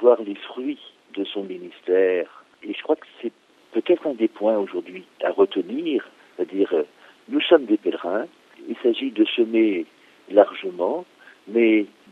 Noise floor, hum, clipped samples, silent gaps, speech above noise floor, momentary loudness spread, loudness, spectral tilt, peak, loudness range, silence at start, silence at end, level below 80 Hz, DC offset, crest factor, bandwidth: -42 dBFS; none; under 0.1%; none; 20 dB; 16 LU; -22 LUFS; -6.5 dB/octave; 0 dBFS; 4 LU; 0 s; 0.25 s; -82 dBFS; under 0.1%; 22 dB; 4.8 kHz